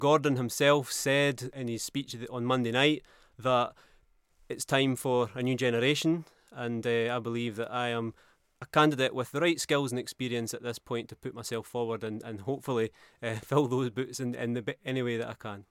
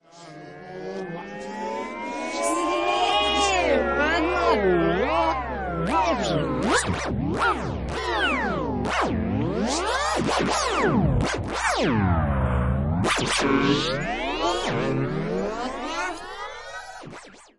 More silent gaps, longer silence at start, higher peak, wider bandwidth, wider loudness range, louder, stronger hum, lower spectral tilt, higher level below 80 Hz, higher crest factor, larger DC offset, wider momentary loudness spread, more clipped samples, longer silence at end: neither; second, 0 s vs 0.15 s; about the same, -8 dBFS vs -8 dBFS; first, 16.5 kHz vs 11.5 kHz; about the same, 5 LU vs 4 LU; second, -30 LUFS vs -24 LUFS; neither; about the same, -4.5 dB/octave vs -4.5 dB/octave; second, -68 dBFS vs -38 dBFS; first, 22 dB vs 16 dB; second, under 0.1% vs 0.2%; about the same, 12 LU vs 14 LU; neither; about the same, 0.1 s vs 0.15 s